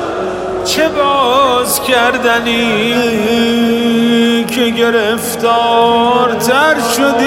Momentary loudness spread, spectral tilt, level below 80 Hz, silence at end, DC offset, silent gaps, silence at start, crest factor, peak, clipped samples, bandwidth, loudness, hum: 4 LU; -3 dB/octave; -44 dBFS; 0 s; under 0.1%; none; 0 s; 12 dB; 0 dBFS; under 0.1%; 16.5 kHz; -11 LUFS; none